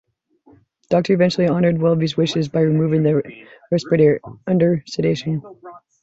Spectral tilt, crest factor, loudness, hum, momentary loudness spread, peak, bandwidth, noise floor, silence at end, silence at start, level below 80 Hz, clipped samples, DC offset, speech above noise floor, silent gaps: -7.5 dB/octave; 16 dB; -18 LUFS; none; 8 LU; -4 dBFS; 8 kHz; -54 dBFS; 0.25 s; 0.9 s; -56 dBFS; under 0.1%; under 0.1%; 37 dB; none